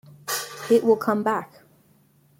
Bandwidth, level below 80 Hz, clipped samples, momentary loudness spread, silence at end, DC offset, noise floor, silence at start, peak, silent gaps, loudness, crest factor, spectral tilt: 16.5 kHz; -72 dBFS; under 0.1%; 10 LU; 0.95 s; under 0.1%; -59 dBFS; 0.25 s; -8 dBFS; none; -23 LUFS; 18 dB; -4 dB/octave